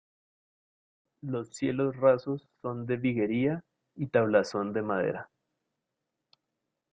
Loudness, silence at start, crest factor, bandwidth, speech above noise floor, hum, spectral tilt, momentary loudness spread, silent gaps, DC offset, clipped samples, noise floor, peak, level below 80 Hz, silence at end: -29 LUFS; 1.25 s; 20 dB; 9.4 kHz; 57 dB; none; -7 dB/octave; 14 LU; none; under 0.1%; under 0.1%; -85 dBFS; -10 dBFS; -68 dBFS; 1.7 s